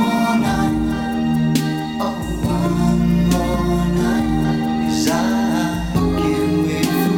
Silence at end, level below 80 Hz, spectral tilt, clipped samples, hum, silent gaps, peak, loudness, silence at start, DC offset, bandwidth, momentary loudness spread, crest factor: 0 s; -30 dBFS; -6 dB/octave; under 0.1%; none; none; -4 dBFS; -18 LUFS; 0 s; under 0.1%; 18 kHz; 4 LU; 14 dB